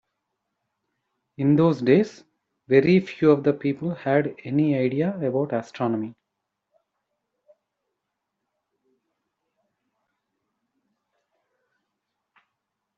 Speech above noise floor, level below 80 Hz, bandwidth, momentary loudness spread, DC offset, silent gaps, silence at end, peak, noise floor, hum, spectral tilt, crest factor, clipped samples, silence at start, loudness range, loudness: 60 dB; -68 dBFS; 7.4 kHz; 9 LU; under 0.1%; none; 6.85 s; -6 dBFS; -82 dBFS; none; -7.5 dB/octave; 20 dB; under 0.1%; 1.4 s; 11 LU; -22 LUFS